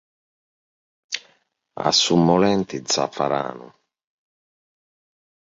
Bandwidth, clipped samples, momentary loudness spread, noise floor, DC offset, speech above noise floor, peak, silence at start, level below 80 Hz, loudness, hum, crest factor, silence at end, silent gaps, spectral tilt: 7.8 kHz; under 0.1%; 15 LU; -64 dBFS; under 0.1%; 44 dB; -2 dBFS; 1.1 s; -58 dBFS; -20 LUFS; none; 22 dB; 1.85 s; none; -4 dB/octave